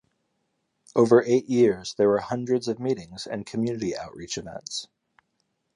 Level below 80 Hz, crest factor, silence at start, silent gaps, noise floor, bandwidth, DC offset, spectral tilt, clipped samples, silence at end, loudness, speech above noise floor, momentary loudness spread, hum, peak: -62 dBFS; 20 dB; 0.95 s; none; -75 dBFS; 11 kHz; under 0.1%; -5.5 dB/octave; under 0.1%; 0.9 s; -25 LUFS; 51 dB; 15 LU; none; -6 dBFS